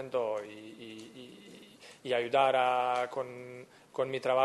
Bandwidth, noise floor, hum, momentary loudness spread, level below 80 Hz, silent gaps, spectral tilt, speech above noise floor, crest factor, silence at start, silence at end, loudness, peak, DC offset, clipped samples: 12 kHz; -54 dBFS; none; 23 LU; -80 dBFS; none; -4.5 dB/octave; 23 dB; 20 dB; 0 s; 0 s; -31 LUFS; -14 dBFS; under 0.1%; under 0.1%